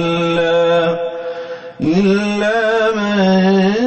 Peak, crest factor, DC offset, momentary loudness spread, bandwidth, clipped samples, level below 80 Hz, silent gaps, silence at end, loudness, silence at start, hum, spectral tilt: -4 dBFS; 12 dB; under 0.1%; 12 LU; 8.4 kHz; under 0.1%; -50 dBFS; none; 0 s; -15 LUFS; 0 s; none; -6.5 dB/octave